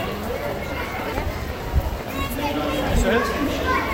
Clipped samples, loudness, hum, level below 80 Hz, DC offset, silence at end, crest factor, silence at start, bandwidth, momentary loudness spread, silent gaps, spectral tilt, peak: under 0.1%; -24 LUFS; none; -30 dBFS; under 0.1%; 0 s; 16 dB; 0 s; 16 kHz; 7 LU; none; -5.5 dB/octave; -8 dBFS